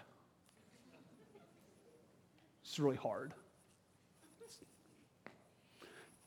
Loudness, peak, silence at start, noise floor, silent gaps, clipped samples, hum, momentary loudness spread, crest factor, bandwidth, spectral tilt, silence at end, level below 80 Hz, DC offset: -41 LUFS; -22 dBFS; 0 s; -71 dBFS; none; under 0.1%; none; 29 LU; 26 dB; 17.5 kHz; -5.5 dB/octave; 0.2 s; -88 dBFS; under 0.1%